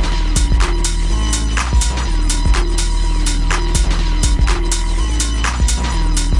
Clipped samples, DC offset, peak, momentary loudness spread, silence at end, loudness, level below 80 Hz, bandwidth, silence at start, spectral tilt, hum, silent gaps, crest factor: under 0.1%; under 0.1%; -2 dBFS; 3 LU; 0 s; -17 LUFS; -14 dBFS; 11.5 kHz; 0 s; -3.5 dB/octave; none; none; 12 dB